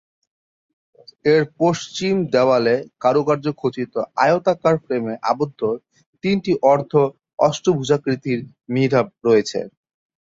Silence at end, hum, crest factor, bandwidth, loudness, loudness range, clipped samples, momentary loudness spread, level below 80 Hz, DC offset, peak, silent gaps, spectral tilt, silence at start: 0.6 s; none; 18 dB; 7.8 kHz; -19 LUFS; 2 LU; under 0.1%; 8 LU; -60 dBFS; under 0.1%; -2 dBFS; 6.06-6.13 s, 7.34-7.38 s; -6 dB/octave; 1.25 s